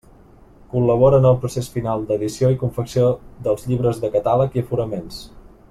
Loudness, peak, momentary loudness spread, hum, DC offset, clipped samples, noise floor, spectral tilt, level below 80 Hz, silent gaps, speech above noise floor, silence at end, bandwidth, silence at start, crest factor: -19 LUFS; -2 dBFS; 11 LU; none; under 0.1%; under 0.1%; -47 dBFS; -8 dB/octave; -44 dBFS; none; 28 dB; 0.3 s; 13.5 kHz; 0.75 s; 16 dB